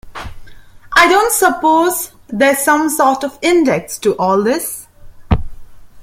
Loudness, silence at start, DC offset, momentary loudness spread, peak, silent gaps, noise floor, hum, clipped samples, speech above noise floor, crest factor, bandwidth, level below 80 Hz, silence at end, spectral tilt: -13 LUFS; 0.05 s; under 0.1%; 14 LU; 0 dBFS; none; -35 dBFS; none; under 0.1%; 22 dB; 14 dB; 16.5 kHz; -32 dBFS; 0 s; -4 dB/octave